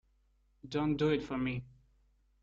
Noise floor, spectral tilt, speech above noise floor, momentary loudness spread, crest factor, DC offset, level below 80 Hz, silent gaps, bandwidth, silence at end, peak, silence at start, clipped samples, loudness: -71 dBFS; -7.5 dB/octave; 38 dB; 8 LU; 18 dB; under 0.1%; -60 dBFS; none; 7.6 kHz; 0.75 s; -20 dBFS; 0.65 s; under 0.1%; -34 LUFS